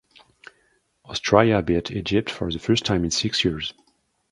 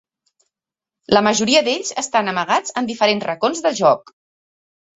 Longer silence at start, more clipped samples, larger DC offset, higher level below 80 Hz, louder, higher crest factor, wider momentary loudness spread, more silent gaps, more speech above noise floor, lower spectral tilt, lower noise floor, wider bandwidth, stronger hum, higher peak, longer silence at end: about the same, 1.1 s vs 1.1 s; neither; neither; first, -44 dBFS vs -60 dBFS; second, -22 LUFS vs -18 LUFS; first, 24 dB vs 18 dB; first, 11 LU vs 6 LU; neither; second, 45 dB vs 70 dB; first, -4.5 dB/octave vs -3 dB/octave; second, -67 dBFS vs -88 dBFS; first, 11.5 kHz vs 8.2 kHz; neither; about the same, 0 dBFS vs -2 dBFS; second, 0.6 s vs 0.95 s